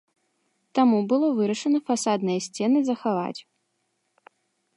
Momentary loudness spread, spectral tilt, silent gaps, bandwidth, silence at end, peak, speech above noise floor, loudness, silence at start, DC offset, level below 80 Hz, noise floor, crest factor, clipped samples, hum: 8 LU; -5.5 dB/octave; none; 11.5 kHz; 1.35 s; -8 dBFS; 52 dB; -24 LUFS; 0.75 s; under 0.1%; -78 dBFS; -74 dBFS; 18 dB; under 0.1%; none